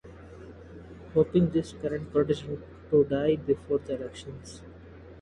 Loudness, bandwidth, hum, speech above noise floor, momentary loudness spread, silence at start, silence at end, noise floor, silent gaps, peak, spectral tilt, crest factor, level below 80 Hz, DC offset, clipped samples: -28 LUFS; 11 kHz; none; 21 dB; 23 LU; 0.05 s; 0 s; -48 dBFS; none; -10 dBFS; -7.5 dB/octave; 18 dB; -52 dBFS; under 0.1%; under 0.1%